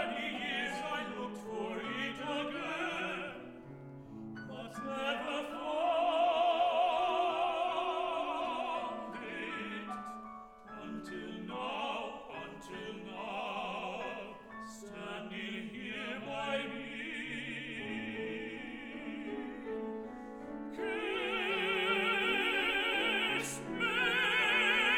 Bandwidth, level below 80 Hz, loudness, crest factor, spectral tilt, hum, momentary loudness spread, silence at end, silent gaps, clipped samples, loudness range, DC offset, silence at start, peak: 17.5 kHz; -66 dBFS; -35 LUFS; 18 dB; -3.5 dB/octave; none; 15 LU; 0 s; none; under 0.1%; 10 LU; under 0.1%; 0 s; -18 dBFS